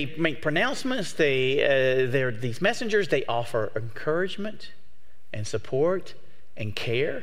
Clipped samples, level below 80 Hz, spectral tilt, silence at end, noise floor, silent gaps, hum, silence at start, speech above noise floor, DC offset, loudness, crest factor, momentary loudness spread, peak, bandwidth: under 0.1%; -62 dBFS; -5 dB/octave; 0 s; -63 dBFS; none; none; 0 s; 37 dB; 3%; -26 LUFS; 18 dB; 12 LU; -8 dBFS; 15.5 kHz